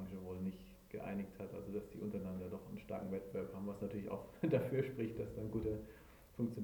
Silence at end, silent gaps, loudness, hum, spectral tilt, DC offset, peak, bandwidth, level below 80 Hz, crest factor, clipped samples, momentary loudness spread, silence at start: 0 s; none; -44 LUFS; none; -8.5 dB/octave; under 0.1%; -22 dBFS; over 20 kHz; -62 dBFS; 22 dB; under 0.1%; 11 LU; 0 s